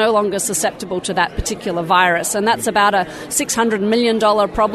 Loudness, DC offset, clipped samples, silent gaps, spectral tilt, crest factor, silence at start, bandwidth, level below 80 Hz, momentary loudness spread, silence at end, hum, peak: -17 LUFS; under 0.1%; under 0.1%; none; -3 dB/octave; 16 dB; 0 s; 13.5 kHz; -38 dBFS; 7 LU; 0 s; none; 0 dBFS